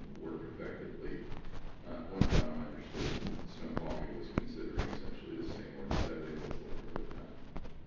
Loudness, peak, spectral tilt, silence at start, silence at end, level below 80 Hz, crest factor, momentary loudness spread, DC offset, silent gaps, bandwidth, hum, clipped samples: -41 LUFS; -12 dBFS; -6.5 dB/octave; 0 s; 0 s; -44 dBFS; 26 dB; 13 LU; under 0.1%; none; 7.4 kHz; none; under 0.1%